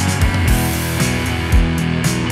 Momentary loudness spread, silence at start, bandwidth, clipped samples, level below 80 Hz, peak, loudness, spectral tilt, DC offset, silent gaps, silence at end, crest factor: 2 LU; 0 s; 16 kHz; under 0.1%; -22 dBFS; -2 dBFS; -17 LUFS; -5 dB/octave; under 0.1%; none; 0 s; 14 dB